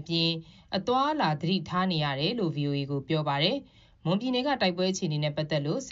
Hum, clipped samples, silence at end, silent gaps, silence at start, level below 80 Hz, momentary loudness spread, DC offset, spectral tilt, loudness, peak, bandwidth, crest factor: none; under 0.1%; 0 s; none; 0 s; -62 dBFS; 5 LU; under 0.1%; -4 dB/octave; -28 LUFS; -10 dBFS; 7.6 kHz; 18 dB